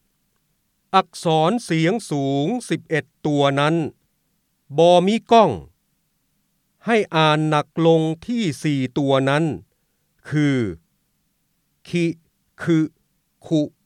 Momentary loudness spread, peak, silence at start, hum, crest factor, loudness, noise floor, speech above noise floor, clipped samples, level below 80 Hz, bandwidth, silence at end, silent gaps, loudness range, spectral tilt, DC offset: 12 LU; -2 dBFS; 0.95 s; none; 18 dB; -20 LUFS; -69 dBFS; 50 dB; under 0.1%; -60 dBFS; 12 kHz; 0.2 s; none; 6 LU; -6 dB/octave; under 0.1%